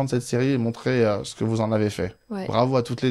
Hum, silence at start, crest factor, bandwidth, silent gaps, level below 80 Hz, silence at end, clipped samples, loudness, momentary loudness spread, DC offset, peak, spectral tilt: none; 0 s; 16 dB; 13.5 kHz; none; -54 dBFS; 0 s; under 0.1%; -24 LUFS; 6 LU; under 0.1%; -6 dBFS; -6.5 dB/octave